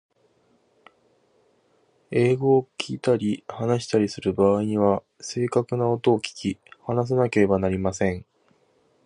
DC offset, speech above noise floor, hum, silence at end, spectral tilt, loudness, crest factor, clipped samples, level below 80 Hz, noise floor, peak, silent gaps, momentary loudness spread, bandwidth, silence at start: under 0.1%; 42 dB; none; 0.85 s; -6.5 dB/octave; -23 LUFS; 18 dB; under 0.1%; -52 dBFS; -64 dBFS; -6 dBFS; none; 9 LU; 11 kHz; 2.1 s